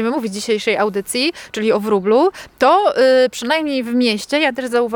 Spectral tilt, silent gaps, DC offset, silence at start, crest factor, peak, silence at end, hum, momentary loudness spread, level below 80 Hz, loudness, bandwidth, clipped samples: -4 dB/octave; none; under 0.1%; 0 s; 14 dB; -2 dBFS; 0 s; none; 7 LU; -58 dBFS; -16 LUFS; 18.5 kHz; under 0.1%